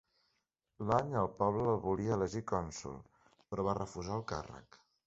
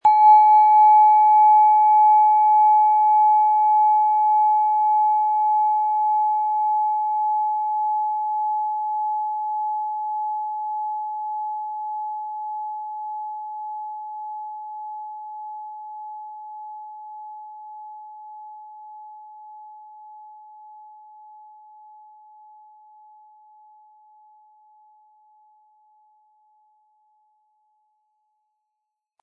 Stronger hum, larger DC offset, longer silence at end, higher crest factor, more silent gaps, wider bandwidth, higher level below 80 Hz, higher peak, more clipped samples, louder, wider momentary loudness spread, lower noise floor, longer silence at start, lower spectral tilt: neither; neither; second, 0.45 s vs 8.9 s; about the same, 20 dB vs 16 dB; neither; first, 8 kHz vs 4.4 kHz; first, -58 dBFS vs -80 dBFS; second, -16 dBFS vs -6 dBFS; neither; second, -36 LUFS vs -18 LUFS; second, 13 LU vs 25 LU; about the same, -83 dBFS vs -82 dBFS; first, 0.8 s vs 0.05 s; first, -7 dB/octave vs -2.5 dB/octave